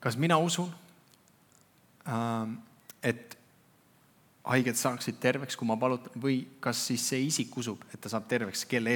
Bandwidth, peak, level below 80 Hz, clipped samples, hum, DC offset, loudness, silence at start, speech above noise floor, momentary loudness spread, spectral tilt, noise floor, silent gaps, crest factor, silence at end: 19 kHz; -10 dBFS; -84 dBFS; under 0.1%; none; under 0.1%; -31 LUFS; 0 s; 33 dB; 15 LU; -4 dB/octave; -63 dBFS; none; 24 dB; 0 s